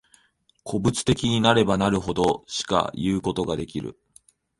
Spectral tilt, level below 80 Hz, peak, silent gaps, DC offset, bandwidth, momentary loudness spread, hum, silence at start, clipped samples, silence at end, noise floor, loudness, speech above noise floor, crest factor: -5 dB/octave; -46 dBFS; -4 dBFS; none; under 0.1%; 11.5 kHz; 13 LU; none; 0.65 s; under 0.1%; 0.65 s; -64 dBFS; -23 LUFS; 41 dB; 22 dB